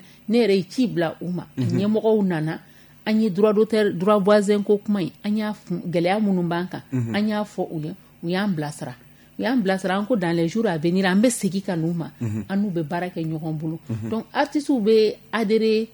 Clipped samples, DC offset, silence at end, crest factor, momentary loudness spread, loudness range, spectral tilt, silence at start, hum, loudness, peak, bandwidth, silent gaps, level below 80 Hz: under 0.1%; under 0.1%; 0.05 s; 16 dB; 11 LU; 5 LU; -6.5 dB/octave; 0.3 s; none; -22 LUFS; -6 dBFS; 19 kHz; none; -64 dBFS